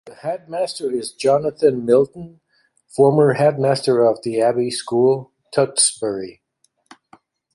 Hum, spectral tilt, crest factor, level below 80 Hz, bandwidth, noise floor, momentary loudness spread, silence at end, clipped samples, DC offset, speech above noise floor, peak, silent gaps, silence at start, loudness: none; -4.5 dB/octave; 18 dB; -62 dBFS; 11.5 kHz; -66 dBFS; 11 LU; 1.25 s; under 0.1%; under 0.1%; 48 dB; -2 dBFS; none; 0.05 s; -18 LUFS